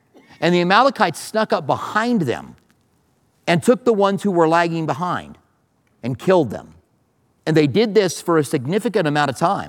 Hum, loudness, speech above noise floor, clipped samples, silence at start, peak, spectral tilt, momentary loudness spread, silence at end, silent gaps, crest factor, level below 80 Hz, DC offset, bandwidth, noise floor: none; -18 LUFS; 44 dB; under 0.1%; 0.4 s; 0 dBFS; -5.5 dB/octave; 10 LU; 0 s; none; 18 dB; -62 dBFS; under 0.1%; 18 kHz; -62 dBFS